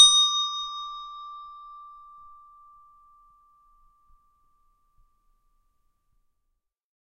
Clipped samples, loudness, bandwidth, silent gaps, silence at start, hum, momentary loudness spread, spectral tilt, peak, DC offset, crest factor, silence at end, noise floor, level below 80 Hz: under 0.1%; -22 LUFS; 13 kHz; none; 0 s; none; 27 LU; 6 dB/octave; -2 dBFS; under 0.1%; 26 dB; 5.3 s; -78 dBFS; -64 dBFS